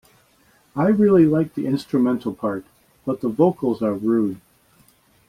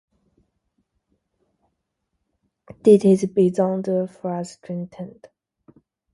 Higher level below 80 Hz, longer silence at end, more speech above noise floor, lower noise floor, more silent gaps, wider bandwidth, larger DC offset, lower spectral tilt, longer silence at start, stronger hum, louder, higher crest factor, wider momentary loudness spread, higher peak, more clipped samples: first, -58 dBFS vs -66 dBFS; second, 0.9 s vs 1.05 s; second, 39 dB vs 57 dB; second, -58 dBFS vs -77 dBFS; neither; first, 14.5 kHz vs 11.5 kHz; neither; about the same, -9 dB/octave vs -8 dB/octave; second, 0.75 s vs 2.85 s; neither; about the same, -20 LUFS vs -20 LUFS; second, 16 dB vs 22 dB; second, 14 LU vs 18 LU; about the same, -4 dBFS vs -2 dBFS; neither